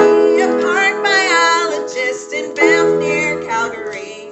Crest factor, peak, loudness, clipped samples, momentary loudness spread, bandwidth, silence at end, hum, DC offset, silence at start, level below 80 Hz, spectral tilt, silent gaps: 14 dB; 0 dBFS; -14 LUFS; under 0.1%; 11 LU; 8.4 kHz; 0 s; none; under 0.1%; 0 s; -58 dBFS; -3 dB/octave; none